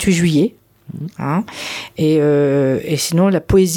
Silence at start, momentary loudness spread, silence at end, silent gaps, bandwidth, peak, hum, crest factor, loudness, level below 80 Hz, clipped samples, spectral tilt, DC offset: 0 s; 12 LU; 0 s; none; 18 kHz; -2 dBFS; none; 12 dB; -16 LUFS; -38 dBFS; under 0.1%; -5.5 dB/octave; under 0.1%